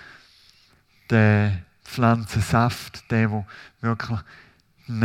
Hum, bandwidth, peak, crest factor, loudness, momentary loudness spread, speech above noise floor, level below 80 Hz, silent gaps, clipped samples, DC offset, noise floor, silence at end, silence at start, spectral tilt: none; 14.5 kHz; -2 dBFS; 22 dB; -23 LUFS; 14 LU; 37 dB; -52 dBFS; none; under 0.1%; under 0.1%; -58 dBFS; 0 s; 1.1 s; -7 dB/octave